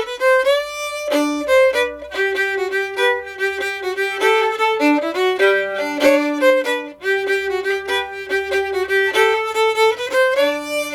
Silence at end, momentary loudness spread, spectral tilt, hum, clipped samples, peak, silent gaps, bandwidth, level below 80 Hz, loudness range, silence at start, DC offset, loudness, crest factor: 0 s; 7 LU; -2 dB/octave; none; under 0.1%; -2 dBFS; none; 18 kHz; -56 dBFS; 2 LU; 0 s; under 0.1%; -17 LUFS; 16 dB